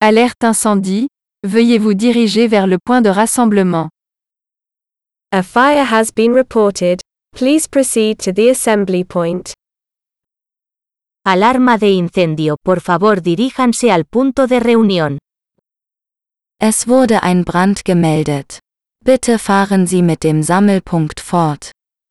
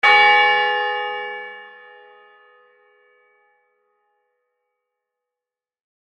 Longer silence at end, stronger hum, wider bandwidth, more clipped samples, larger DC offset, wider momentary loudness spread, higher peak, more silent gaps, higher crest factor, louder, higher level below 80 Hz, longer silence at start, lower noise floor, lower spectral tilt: second, 0.4 s vs 4.35 s; neither; first, 12.5 kHz vs 9.6 kHz; neither; neither; second, 8 LU vs 23 LU; about the same, 0 dBFS vs -2 dBFS; neither; second, 14 dB vs 20 dB; first, -13 LUFS vs -16 LUFS; first, -48 dBFS vs -76 dBFS; about the same, 0 s vs 0.05 s; second, -84 dBFS vs -89 dBFS; first, -5 dB/octave vs -0.5 dB/octave